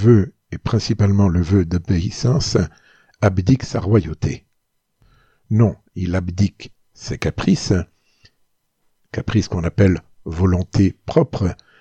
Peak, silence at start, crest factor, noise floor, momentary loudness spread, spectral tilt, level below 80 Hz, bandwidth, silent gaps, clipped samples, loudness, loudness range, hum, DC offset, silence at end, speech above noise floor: -2 dBFS; 0 s; 18 dB; -69 dBFS; 11 LU; -7 dB/octave; -38 dBFS; 8.4 kHz; none; under 0.1%; -19 LUFS; 5 LU; none; under 0.1%; 0.25 s; 51 dB